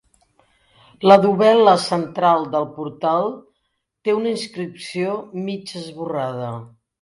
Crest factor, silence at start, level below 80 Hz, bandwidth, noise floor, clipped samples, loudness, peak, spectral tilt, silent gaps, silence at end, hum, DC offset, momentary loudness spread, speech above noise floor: 20 dB; 1 s; -66 dBFS; 11.5 kHz; -73 dBFS; under 0.1%; -19 LUFS; 0 dBFS; -6 dB/octave; none; 0.35 s; none; under 0.1%; 17 LU; 55 dB